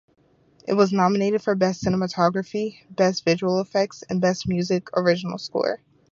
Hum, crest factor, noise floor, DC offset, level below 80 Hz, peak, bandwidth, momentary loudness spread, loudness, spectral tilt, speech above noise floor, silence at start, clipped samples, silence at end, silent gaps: none; 20 dB; -57 dBFS; under 0.1%; -56 dBFS; -4 dBFS; 7.4 kHz; 8 LU; -23 LUFS; -6 dB/octave; 35 dB; 0.65 s; under 0.1%; 0.35 s; none